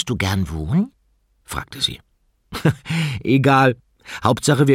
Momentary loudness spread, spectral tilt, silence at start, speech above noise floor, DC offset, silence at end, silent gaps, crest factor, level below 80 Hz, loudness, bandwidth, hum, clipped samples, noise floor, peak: 16 LU; -5.5 dB/octave; 0 s; 44 dB; under 0.1%; 0 s; none; 18 dB; -42 dBFS; -20 LUFS; 16 kHz; none; under 0.1%; -62 dBFS; -2 dBFS